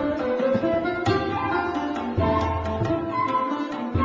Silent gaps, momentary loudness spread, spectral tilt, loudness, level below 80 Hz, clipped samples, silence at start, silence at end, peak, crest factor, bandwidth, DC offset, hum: none; 4 LU; -7.5 dB/octave; -24 LUFS; -38 dBFS; under 0.1%; 0 s; 0 s; -10 dBFS; 14 dB; 7.6 kHz; under 0.1%; none